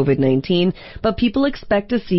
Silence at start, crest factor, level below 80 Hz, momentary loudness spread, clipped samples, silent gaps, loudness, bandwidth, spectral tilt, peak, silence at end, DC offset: 0 s; 12 dB; -40 dBFS; 5 LU; under 0.1%; none; -19 LUFS; 5.8 kHz; -10 dB/octave; -6 dBFS; 0 s; under 0.1%